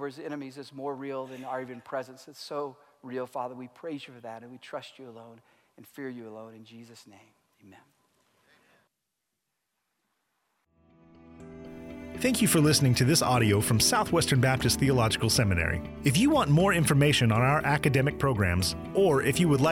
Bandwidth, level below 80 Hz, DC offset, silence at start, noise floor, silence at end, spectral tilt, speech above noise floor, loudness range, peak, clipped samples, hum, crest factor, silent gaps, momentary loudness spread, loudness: 16 kHz; -50 dBFS; under 0.1%; 0 s; -83 dBFS; 0 s; -4.5 dB/octave; 56 dB; 21 LU; -10 dBFS; under 0.1%; none; 18 dB; none; 21 LU; -25 LUFS